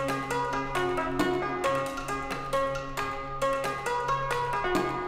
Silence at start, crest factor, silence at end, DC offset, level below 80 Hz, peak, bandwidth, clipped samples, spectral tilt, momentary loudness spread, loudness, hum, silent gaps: 0 s; 16 dB; 0 s; under 0.1%; -46 dBFS; -12 dBFS; 16.5 kHz; under 0.1%; -4.5 dB/octave; 5 LU; -29 LUFS; none; none